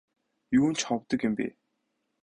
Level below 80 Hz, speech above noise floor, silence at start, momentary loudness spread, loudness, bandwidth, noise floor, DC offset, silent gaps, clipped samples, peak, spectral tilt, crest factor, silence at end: -64 dBFS; 52 dB; 0.5 s; 8 LU; -28 LUFS; 10.5 kHz; -79 dBFS; under 0.1%; none; under 0.1%; -14 dBFS; -4.5 dB/octave; 16 dB; 0.75 s